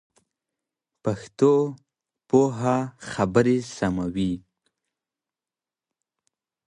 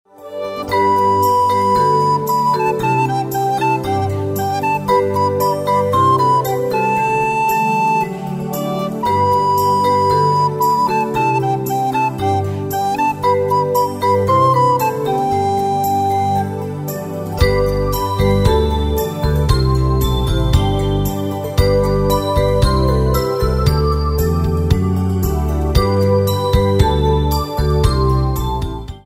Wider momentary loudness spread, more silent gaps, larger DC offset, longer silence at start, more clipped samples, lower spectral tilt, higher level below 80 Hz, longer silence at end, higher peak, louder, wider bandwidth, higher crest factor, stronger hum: first, 10 LU vs 6 LU; neither; neither; first, 1.05 s vs 0.2 s; neither; about the same, -7 dB/octave vs -6.5 dB/octave; second, -54 dBFS vs -24 dBFS; first, 2.3 s vs 0.05 s; second, -4 dBFS vs 0 dBFS; second, -24 LUFS vs -16 LUFS; second, 11 kHz vs 16 kHz; first, 22 dB vs 14 dB; neither